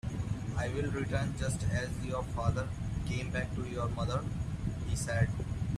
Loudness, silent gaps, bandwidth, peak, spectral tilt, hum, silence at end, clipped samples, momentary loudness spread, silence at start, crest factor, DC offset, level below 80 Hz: -35 LUFS; none; 13.5 kHz; -16 dBFS; -6 dB/octave; none; 0 s; under 0.1%; 4 LU; 0.05 s; 18 dB; under 0.1%; -44 dBFS